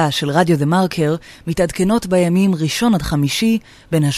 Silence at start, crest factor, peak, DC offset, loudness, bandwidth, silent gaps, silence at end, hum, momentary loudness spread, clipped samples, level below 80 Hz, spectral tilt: 0 s; 14 dB; -2 dBFS; under 0.1%; -17 LUFS; 14 kHz; none; 0 s; none; 6 LU; under 0.1%; -40 dBFS; -5.5 dB/octave